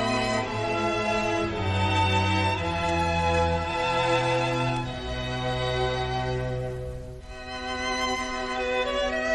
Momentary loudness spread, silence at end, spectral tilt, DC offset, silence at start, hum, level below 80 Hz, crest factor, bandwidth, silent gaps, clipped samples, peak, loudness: 9 LU; 0 s; -5 dB/octave; under 0.1%; 0 s; none; -42 dBFS; 16 dB; 12 kHz; none; under 0.1%; -12 dBFS; -26 LUFS